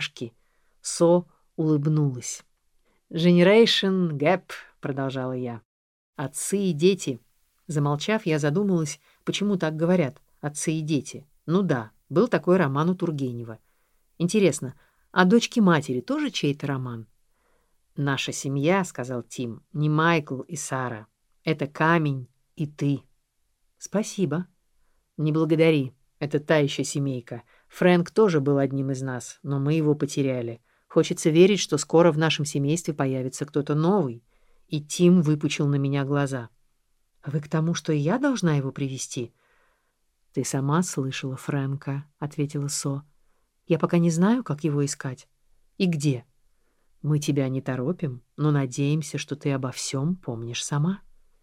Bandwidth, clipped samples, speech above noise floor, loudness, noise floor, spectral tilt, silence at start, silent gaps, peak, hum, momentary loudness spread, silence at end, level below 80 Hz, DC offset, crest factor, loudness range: 15.5 kHz; under 0.1%; 47 dB; -25 LUFS; -71 dBFS; -5.5 dB/octave; 0 s; 5.65-6.13 s; -4 dBFS; none; 14 LU; 0.45 s; -64 dBFS; under 0.1%; 22 dB; 6 LU